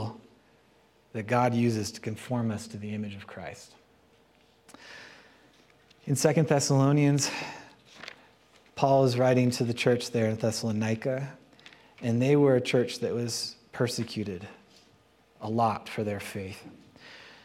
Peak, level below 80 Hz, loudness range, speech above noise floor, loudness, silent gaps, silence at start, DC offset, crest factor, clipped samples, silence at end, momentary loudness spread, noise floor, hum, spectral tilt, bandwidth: -8 dBFS; -70 dBFS; 10 LU; 36 dB; -27 LUFS; none; 0 s; under 0.1%; 22 dB; under 0.1%; 0.15 s; 22 LU; -63 dBFS; none; -5.5 dB/octave; 15.5 kHz